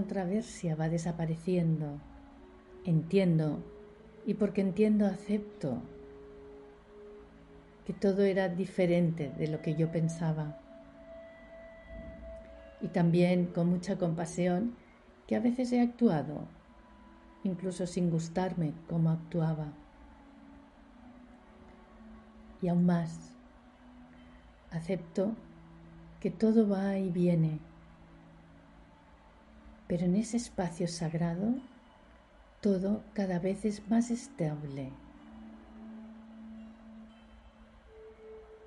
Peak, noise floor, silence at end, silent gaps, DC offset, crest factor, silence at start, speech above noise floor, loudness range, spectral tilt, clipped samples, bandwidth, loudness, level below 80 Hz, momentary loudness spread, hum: -14 dBFS; -58 dBFS; 0 s; none; under 0.1%; 18 dB; 0 s; 28 dB; 7 LU; -7.5 dB/octave; under 0.1%; 11.5 kHz; -32 LUFS; -60 dBFS; 24 LU; none